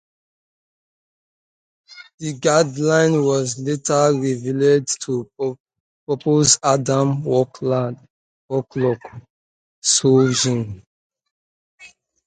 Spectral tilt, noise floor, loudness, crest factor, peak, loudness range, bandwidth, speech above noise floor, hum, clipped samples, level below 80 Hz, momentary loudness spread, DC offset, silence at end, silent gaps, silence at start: -4.5 dB/octave; under -90 dBFS; -19 LUFS; 20 dB; 0 dBFS; 3 LU; 9.6 kHz; over 72 dB; none; under 0.1%; -58 dBFS; 13 LU; under 0.1%; 0.4 s; 2.14-2.18 s, 5.60-5.64 s, 5.80-6.07 s, 8.10-8.49 s, 9.30-9.82 s, 10.87-11.10 s, 11.31-11.78 s; 1.9 s